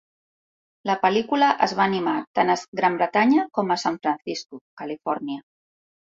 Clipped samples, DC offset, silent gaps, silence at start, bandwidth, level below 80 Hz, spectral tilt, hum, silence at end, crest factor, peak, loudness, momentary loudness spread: under 0.1%; under 0.1%; 2.27-2.34 s, 2.68-2.72 s, 4.61-4.77 s; 0.85 s; 7.8 kHz; -68 dBFS; -5 dB/octave; none; 0.65 s; 20 dB; -4 dBFS; -22 LUFS; 14 LU